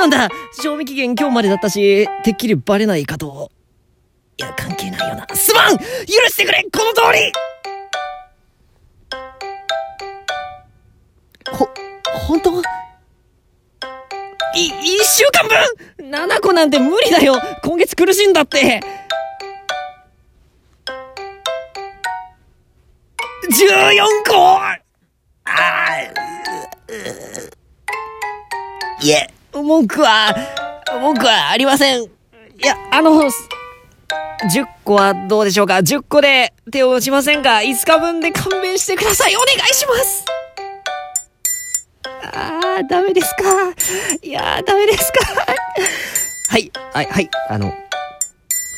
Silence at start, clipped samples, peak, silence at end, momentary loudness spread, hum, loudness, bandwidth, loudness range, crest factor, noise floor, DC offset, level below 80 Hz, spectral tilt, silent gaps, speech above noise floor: 0 s; under 0.1%; 0 dBFS; 0 s; 18 LU; none; -14 LUFS; 17 kHz; 10 LU; 16 dB; -60 dBFS; under 0.1%; -46 dBFS; -2.5 dB/octave; none; 46 dB